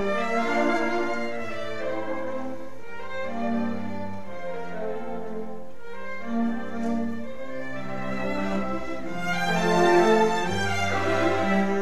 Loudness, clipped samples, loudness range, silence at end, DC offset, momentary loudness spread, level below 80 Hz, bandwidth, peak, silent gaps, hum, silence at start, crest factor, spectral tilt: -27 LUFS; under 0.1%; 9 LU; 0 s; 3%; 15 LU; -54 dBFS; 14.5 kHz; -8 dBFS; none; none; 0 s; 20 dB; -5.5 dB/octave